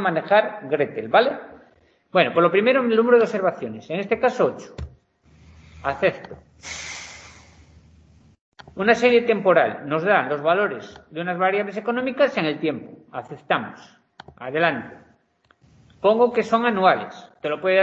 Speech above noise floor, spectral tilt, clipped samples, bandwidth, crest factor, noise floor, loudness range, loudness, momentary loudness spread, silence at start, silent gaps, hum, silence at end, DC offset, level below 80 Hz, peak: 41 dB; -5.5 dB/octave; under 0.1%; 8 kHz; 20 dB; -62 dBFS; 8 LU; -21 LUFS; 19 LU; 0 s; 8.41-8.52 s; none; 0 s; under 0.1%; -54 dBFS; -2 dBFS